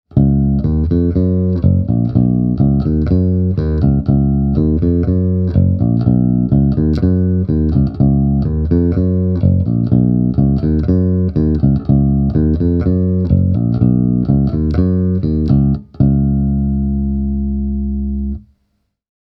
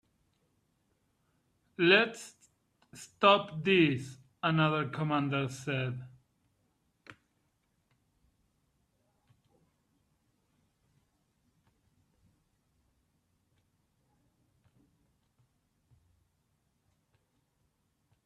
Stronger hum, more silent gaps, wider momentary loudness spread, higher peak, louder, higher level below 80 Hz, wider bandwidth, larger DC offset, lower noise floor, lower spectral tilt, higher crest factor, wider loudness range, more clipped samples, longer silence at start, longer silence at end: neither; neither; second, 4 LU vs 14 LU; first, 0 dBFS vs -10 dBFS; first, -14 LUFS vs -29 LUFS; first, -22 dBFS vs -74 dBFS; second, 5 kHz vs 13 kHz; neither; second, -65 dBFS vs -77 dBFS; first, -13 dB/octave vs -5.5 dB/octave; second, 14 dB vs 26 dB; second, 2 LU vs 11 LU; neither; second, 0.15 s vs 1.8 s; second, 1 s vs 11.15 s